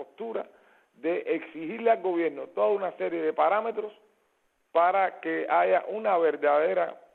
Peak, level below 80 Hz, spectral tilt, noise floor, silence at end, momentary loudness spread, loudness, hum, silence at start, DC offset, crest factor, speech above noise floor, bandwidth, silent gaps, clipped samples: -12 dBFS; -86 dBFS; -7.5 dB/octave; -71 dBFS; 0.2 s; 12 LU; -27 LUFS; none; 0 s; under 0.1%; 16 dB; 45 dB; 4.3 kHz; none; under 0.1%